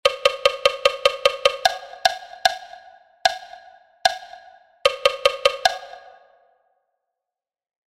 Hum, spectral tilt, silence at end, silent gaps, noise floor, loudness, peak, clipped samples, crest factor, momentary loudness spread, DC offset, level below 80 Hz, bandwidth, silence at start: none; 0.5 dB/octave; 1.9 s; none; -89 dBFS; -21 LUFS; 0 dBFS; under 0.1%; 22 dB; 5 LU; under 0.1%; -56 dBFS; 16 kHz; 0.05 s